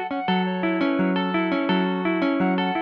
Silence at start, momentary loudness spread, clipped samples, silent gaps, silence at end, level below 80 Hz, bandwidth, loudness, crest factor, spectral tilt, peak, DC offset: 0 s; 2 LU; under 0.1%; none; 0 s; -62 dBFS; 5.4 kHz; -23 LUFS; 12 dB; -8.5 dB/octave; -10 dBFS; under 0.1%